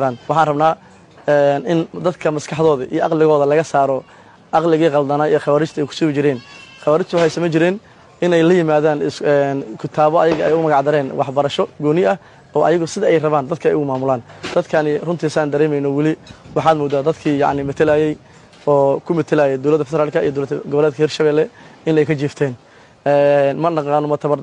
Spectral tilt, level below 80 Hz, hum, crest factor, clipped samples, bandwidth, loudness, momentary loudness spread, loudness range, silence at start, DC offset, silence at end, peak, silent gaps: -6.5 dB/octave; -56 dBFS; none; 14 dB; under 0.1%; 10 kHz; -17 LUFS; 7 LU; 2 LU; 0 s; under 0.1%; 0 s; -2 dBFS; none